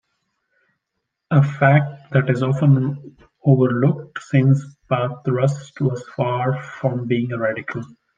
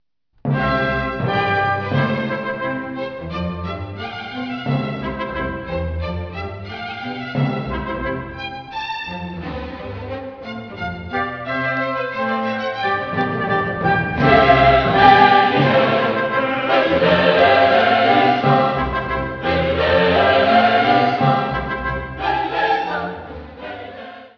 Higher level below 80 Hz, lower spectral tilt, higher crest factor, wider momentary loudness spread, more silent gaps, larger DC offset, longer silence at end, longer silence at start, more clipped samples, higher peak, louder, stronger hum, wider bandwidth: second, -62 dBFS vs -38 dBFS; about the same, -8.5 dB/octave vs -7.5 dB/octave; about the same, 18 dB vs 18 dB; second, 9 LU vs 16 LU; neither; neither; first, 0.3 s vs 0.1 s; first, 1.3 s vs 0.45 s; neither; about the same, -2 dBFS vs 0 dBFS; about the same, -20 LUFS vs -18 LUFS; neither; first, 7.4 kHz vs 5.4 kHz